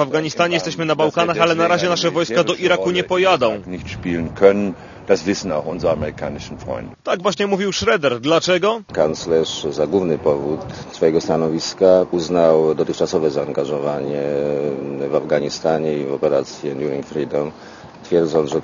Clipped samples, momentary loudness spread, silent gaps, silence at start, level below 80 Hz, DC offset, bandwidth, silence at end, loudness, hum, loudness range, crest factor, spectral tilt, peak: under 0.1%; 11 LU; none; 0 s; -48 dBFS; under 0.1%; 7.4 kHz; 0 s; -18 LUFS; none; 4 LU; 18 dB; -5 dB/octave; 0 dBFS